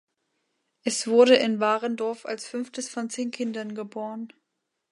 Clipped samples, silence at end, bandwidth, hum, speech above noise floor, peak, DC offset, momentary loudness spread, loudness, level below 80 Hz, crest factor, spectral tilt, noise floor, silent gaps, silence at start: under 0.1%; 0.65 s; 11.5 kHz; none; 55 dB; -4 dBFS; under 0.1%; 16 LU; -25 LUFS; -82 dBFS; 22 dB; -3 dB/octave; -80 dBFS; none; 0.85 s